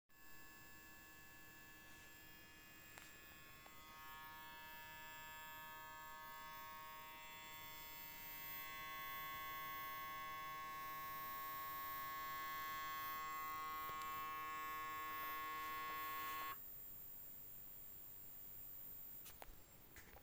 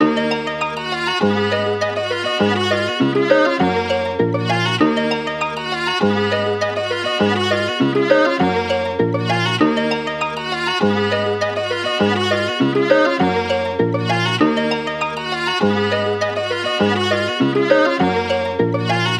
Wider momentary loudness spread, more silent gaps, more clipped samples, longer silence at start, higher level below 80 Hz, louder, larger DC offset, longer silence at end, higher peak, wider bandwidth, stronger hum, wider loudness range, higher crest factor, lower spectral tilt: first, 13 LU vs 6 LU; neither; neither; about the same, 0.1 s vs 0 s; second, -72 dBFS vs -54 dBFS; second, -50 LUFS vs -18 LUFS; neither; about the same, 0 s vs 0 s; second, -32 dBFS vs -2 dBFS; first, 17 kHz vs 13 kHz; neither; first, 11 LU vs 1 LU; about the same, 20 dB vs 16 dB; second, -1.5 dB/octave vs -5.5 dB/octave